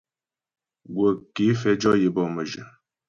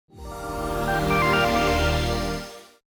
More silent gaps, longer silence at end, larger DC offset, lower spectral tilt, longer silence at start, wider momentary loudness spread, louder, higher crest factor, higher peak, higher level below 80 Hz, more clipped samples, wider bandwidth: neither; first, 0.4 s vs 0.25 s; neither; first, -6.5 dB/octave vs -5 dB/octave; first, 0.9 s vs 0.15 s; about the same, 13 LU vs 15 LU; about the same, -23 LUFS vs -23 LUFS; about the same, 18 dB vs 14 dB; about the same, -8 dBFS vs -10 dBFS; second, -60 dBFS vs -34 dBFS; neither; second, 7.4 kHz vs over 20 kHz